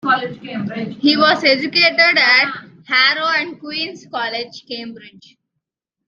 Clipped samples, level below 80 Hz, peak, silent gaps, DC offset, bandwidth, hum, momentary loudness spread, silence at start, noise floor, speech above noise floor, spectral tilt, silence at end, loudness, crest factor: under 0.1%; -68 dBFS; 0 dBFS; none; under 0.1%; 7.4 kHz; none; 17 LU; 0.05 s; -79 dBFS; 62 dB; -4 dB/octave; 1 s; -15 LUFS; 18 dB